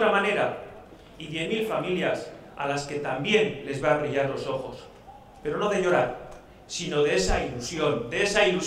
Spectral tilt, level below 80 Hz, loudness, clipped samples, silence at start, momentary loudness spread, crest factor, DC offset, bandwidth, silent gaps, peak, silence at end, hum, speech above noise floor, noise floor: -4 dB/octave; -44 dBFS; -26 LUFS; under 0.1%; 0 s; 16 LU; 20 dB; under 0.1%; 14.5 kHz; none; -8 dBFS; 0 s; none; 22 dB; -48 dBFS